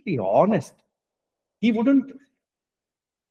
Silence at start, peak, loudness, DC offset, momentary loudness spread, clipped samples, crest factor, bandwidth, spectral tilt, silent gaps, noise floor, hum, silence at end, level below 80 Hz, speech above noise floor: 0.05 s; -4 dBFS; -21 LUFS; under 0.1%; 7 LU; under 0.1%; 20 dB; 10 kHz; -7.5 dB/octave; none; -90 dBFS; none; 1.2 s; -70 dBFS; 69 dB